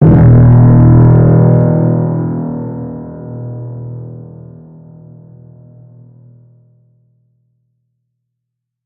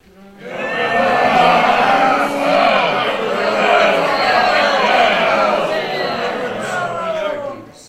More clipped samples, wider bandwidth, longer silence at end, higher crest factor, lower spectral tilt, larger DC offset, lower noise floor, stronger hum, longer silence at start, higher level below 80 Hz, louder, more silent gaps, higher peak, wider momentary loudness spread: first, 0.2% vs under 0.1%; second, 2.3 kHz vs 15.5 kHz; first, 4.6 s vs 0.05 s; about the same, 12 dB vs 16 dB; first, -14.5 dB/octave vs -4 dB/octave; neither; first, -76 dBFS vs -36 dBFS; neither; second, 0 s vs 0.2 s; first, -30 dBFS vs -52 dBFS; first, -8 LUFS vs -15 LUFS; neither; about the same, 0 dBFS vs 0 dBFS; first, 21 LU vs 9 LU